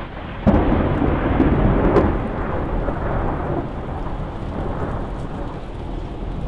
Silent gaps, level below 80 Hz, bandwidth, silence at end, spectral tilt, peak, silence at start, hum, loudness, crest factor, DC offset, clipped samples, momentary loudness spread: none; -26 dBFS; 5.8 kHz; 0 s; -9.5 dB/octave; -4 dBFS; 0 s; none; -22 LUFS; 16 dB; under 0.1%; under 0.1%; 13 LU